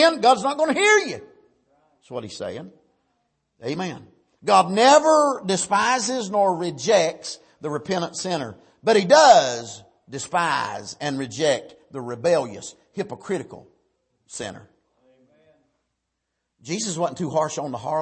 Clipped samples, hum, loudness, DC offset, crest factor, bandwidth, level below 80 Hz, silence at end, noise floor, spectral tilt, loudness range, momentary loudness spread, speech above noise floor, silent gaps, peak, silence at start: under 0.1%; none; -20 LUFS; under 0.1%; 20 dB; 8.8 kHz; -68 dBFS; 0 s; -79 dBFS; -3.5 dB/octave; 16 LU; 20 LU; 58 dB; none; -2 dBFS; 0 s